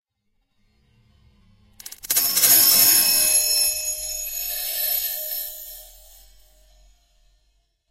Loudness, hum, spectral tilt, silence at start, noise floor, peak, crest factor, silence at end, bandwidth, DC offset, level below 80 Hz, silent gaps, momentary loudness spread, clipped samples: -17 LUFS; none; 1.5 dB/octave; 1.85 s; -71 dBFS; -2 dBFS; 22 dB; 2.05 s; 16 kHz; under 0.1%; -54 dBFS; none; 20 LU; under 0.1%